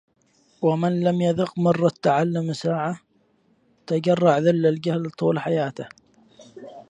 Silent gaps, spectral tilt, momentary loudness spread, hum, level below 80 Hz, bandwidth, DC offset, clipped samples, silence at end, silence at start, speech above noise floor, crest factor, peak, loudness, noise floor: none; -7.5 dB/octave; 11 LU; none; -66 dBFS; 9.4 kHz; under 0.1%; under 0.1%; 0.1 s; 0.6 s; 42 dB; 18 dB; -4 dBFS; -22 LUFS; -63 dBFS